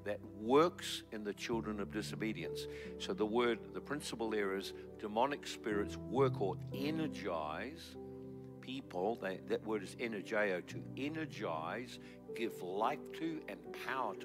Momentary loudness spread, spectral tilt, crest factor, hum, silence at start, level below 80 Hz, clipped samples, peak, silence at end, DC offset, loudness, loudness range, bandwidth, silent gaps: 12 LU; -5.5 dB/octave; 20 dB; none; 0 s; -66 dBFS; under 0.1%; -18 dBFS; 0 s; under 0.1%; -39 LUFS; 4 LU; 16 kHz; none